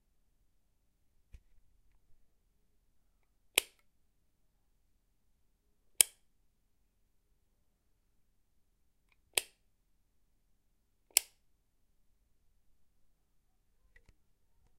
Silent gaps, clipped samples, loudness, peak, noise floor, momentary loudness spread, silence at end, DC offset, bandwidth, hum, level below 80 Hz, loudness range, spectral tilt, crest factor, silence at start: none; under 0.1%; -32 LUFS; -2 dBFS; -76 dBFS; 7 LU; 3.55 s; under 0.1%; 15 kHz; none; -72 dBFS; 7 LU; 2 dB/octave; 42 dB; 3.55 s